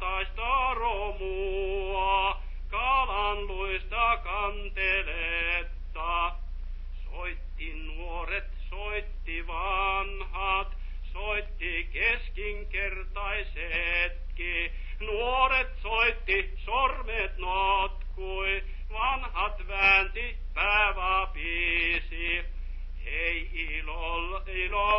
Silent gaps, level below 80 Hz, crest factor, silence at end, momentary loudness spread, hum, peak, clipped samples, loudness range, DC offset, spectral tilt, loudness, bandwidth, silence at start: none; -34 dBFS; 20 dB; 0 s; 13 LU; none; -10 dBFS; under 0.1%; 7 LU; under 0.1%; -1 dB/octave; -29 LUFS; 5.8 kHz; 0 s